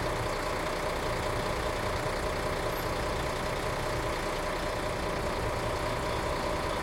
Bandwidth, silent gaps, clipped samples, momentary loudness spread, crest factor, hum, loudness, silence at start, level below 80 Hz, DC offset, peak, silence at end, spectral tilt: 16.5 kHz; none; under 0.1%; 1 LU; 14 dB; none; -32 LUFS; 0 s; -40 dBFS; under 0.1%; -18 dBFS; 0 s; -4.5 dB/octave